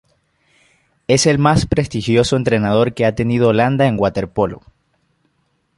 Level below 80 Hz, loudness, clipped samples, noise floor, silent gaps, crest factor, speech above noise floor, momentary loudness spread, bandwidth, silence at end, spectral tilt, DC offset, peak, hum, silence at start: -38 dBFS; -16 LUFS; under 0.1%; -65 dBFS; none; 16 dB; 50 dB; 7 LU; 11.5 kHz; 1.2 s; -5.5 dB/octave; under 0.1%; -2 dBFS; none; 1.1 s